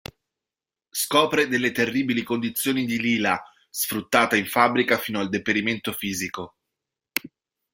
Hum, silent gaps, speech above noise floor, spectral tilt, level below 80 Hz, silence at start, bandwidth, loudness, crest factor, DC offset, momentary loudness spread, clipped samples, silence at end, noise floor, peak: none; none; over 67 dB; -3.5 dB/octave; -62 dBFS; 0.95 s; 16.5 kHz; -23 LUFS; 22 dB; under 0.1%; 11 LU; under 0.1%; 0.45 s; under -90 dBFS; -2 dBFS